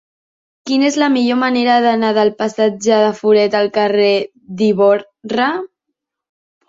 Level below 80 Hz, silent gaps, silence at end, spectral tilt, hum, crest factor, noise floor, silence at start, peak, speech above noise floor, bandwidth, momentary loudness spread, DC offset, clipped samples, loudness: -62 dBFS; none; 1 s; -4.5 dB/octave; none; 14 dB; -77 dBFS; 0.65 s; -2 dBFS; 63 dB; 7.8 kHz; 7 LU; under 0.1%; under 0.1%; -14 LUFS